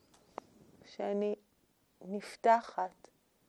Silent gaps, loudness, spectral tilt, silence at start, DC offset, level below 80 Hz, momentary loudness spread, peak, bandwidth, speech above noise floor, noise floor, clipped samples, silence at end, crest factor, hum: none; -35 LUFS; -5.5 dB/octave; 0.9 s; under 0.1%; -82 dBFS; 22 LU; -14 dBFS; 12 kHz; 39 dB; -73 dBFS; under 0.1%; 0.6 s; 22 dB; none